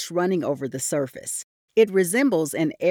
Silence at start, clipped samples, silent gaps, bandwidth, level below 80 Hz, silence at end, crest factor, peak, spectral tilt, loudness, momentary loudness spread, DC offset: 0 s; under 0.1%; 1.44-1.68 s; 19.5 kHz; -72 dBFS; 0 s; 16 dB; -6 dBFS; -4.5 dB/octave; -23 LUFS; 10 LU; under 0.1%